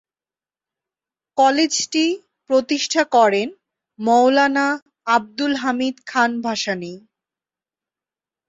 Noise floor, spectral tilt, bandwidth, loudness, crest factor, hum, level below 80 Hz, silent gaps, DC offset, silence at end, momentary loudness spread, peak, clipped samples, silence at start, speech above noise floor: under -90 dBFS; -2.5 dB/octave; 8 kHz; -19 LUFS; 18 dB; none; -68 dBFS; 4.82-4.86 s; under 0.1%; 1.5 s; 11 LU; -4 dBFS; under 0.1%; 1.35 s; over 72 dB